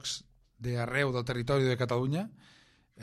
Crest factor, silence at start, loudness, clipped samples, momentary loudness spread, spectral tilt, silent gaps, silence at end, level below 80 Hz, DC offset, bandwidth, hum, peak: 18 dB; 0.05 s; -31 LUFS; under 0.1%; 11 LU; -5.5 dB/octave; none; 0 s; -58 dBFS; under 0.1%; 13 kHz; none; -14 dBFS